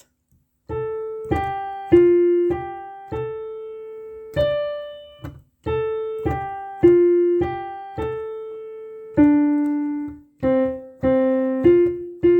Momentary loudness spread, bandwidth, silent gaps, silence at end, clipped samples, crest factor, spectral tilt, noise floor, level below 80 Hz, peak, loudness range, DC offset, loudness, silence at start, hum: 19 LU; 4.5 kHz; none; 0 s; under 0.1%; 18 dB; -9 dB/octave; -64 dBFS; -44 dBFS; -4 dBFS; 7 LU; under 0.1%; -20 LUFS; 0.7 s; none